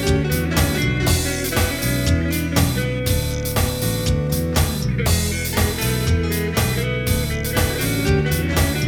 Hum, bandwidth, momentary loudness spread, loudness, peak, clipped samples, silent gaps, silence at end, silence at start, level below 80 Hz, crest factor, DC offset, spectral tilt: none; over 20 kHz; 2 LU; -20 LUFS; -4 dBFS; under 0.1%; none; 0 s; 0 s; -28 dBFS; 16 dB; under 0.1%; -4.5 dB/octave